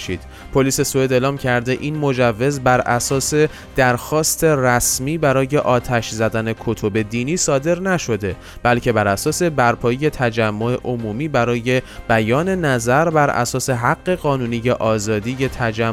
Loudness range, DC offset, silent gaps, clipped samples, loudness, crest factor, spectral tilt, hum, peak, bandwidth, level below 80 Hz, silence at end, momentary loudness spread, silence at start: 2 LU; under 0.1%; none; under 0.1%; -18 LUFS; 14 dB; -5 dB/octave; none; -2 dBFS; 16.5 kHz; -40 dBFS; 0 s; 6 LU; 0 s